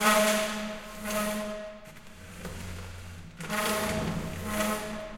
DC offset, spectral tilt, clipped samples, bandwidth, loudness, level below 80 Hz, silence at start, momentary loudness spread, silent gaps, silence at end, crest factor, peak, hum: under 0.1%; -3.5 dB/octave; under 0.1%; 16.5 kHz; -30 LUFS; -48 dBFS; 0 s; 18 LU; none; 0 s; 22 dB; -10 dBFS; none